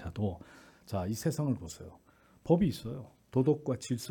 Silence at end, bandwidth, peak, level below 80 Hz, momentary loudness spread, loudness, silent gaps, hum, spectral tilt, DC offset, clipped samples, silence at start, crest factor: 0 s; 18 kHz; -12 dBFS; -58 dBFS; 19 LU; -33 LUFS; none; none; -7 dB/octave; under 0.1%; under 0.1%; 0 s; 20 dB